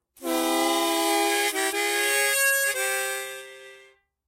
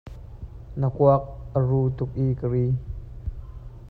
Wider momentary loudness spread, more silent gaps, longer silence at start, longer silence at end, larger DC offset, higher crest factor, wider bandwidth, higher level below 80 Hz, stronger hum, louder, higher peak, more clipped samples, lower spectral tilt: second, 11 LU vs 22 LU; neither; first, 0.2 s vs 0.05 s; first, 0.5 s vs 0 s; neither; about the same, 16 dB vs 18 dB; first, 16 kHz vs 4.1 kHz; second, -70 dBFS vs -40 dBFS; neither; about the same, -23 LUFS vs -24 LUFS; second, -10 dBFS vs -6 dBFS; neither; second, 1 dB/octave vs -12 dB/octave